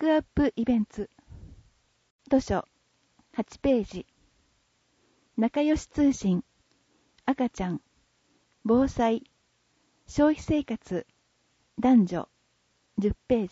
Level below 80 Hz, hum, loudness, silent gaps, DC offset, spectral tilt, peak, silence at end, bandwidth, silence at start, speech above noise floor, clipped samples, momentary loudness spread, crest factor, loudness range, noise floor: -48 dBFS; none; -27 LUFS; 2.11-2.19 s; under 0.1%; -7 dB/octave; -12 dBFS; 0.05 s; 8 kHz; 0 s; 45 dB; under 0.1%; 15 LU; 18 dB; 4 LU; -70 dBFS